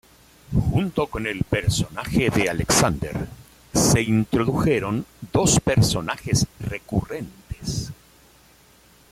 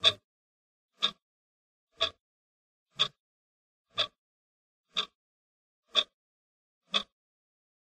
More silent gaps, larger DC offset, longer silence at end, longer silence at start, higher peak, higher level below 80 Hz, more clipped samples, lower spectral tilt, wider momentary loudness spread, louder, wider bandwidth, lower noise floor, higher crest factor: second, none vs 0.24-0.89 s, 1.22-1.87 s, 2.21-2.86 s, 3.20-3.85 s, 4.18-4.84 s, 5.15-5.83 s, 6.13-6.81 s; neither; first, 1.2 s vs 0.95 s; first, 0.5 s vs 0 s; about the same, -6 dBFS vs -8 dBFS; first, -40 dBFS vs -74 dBFS; neither; first, -4.5 dB/octave vs -1 dB/octave; about the same, 13 LU vs 11 LU; first, -22 LUFS vs -32 LUFS; first, 16 kHz vs 14.5 kHz; second, -54 dBFS vs under -90 dBFS; second, 18 dB vs 30 dB